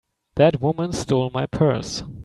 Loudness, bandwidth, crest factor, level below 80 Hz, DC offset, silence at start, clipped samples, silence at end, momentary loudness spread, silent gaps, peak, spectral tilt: -21 LUFS; 12 kHz; 18 dB; -46 dBFS; under 0.1%; 0.35 s; under 0.1%; 0 s; 9 LU; none; -4 dBFS; -6.5 dB/octave